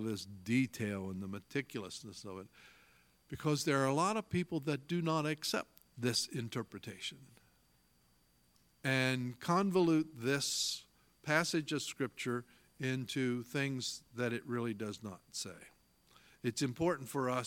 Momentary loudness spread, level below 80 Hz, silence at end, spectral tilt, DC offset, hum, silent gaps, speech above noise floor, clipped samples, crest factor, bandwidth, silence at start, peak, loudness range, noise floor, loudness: 12 LU; -72 dBFS; 0 s; -4.5 dB/octave; under 0.1%; none; none; 35 dB; under 0.1%; 24 dB; 17 kHz; 0 s; -14 dBFS; 6 LU; -72 dBFS; -37 LUFS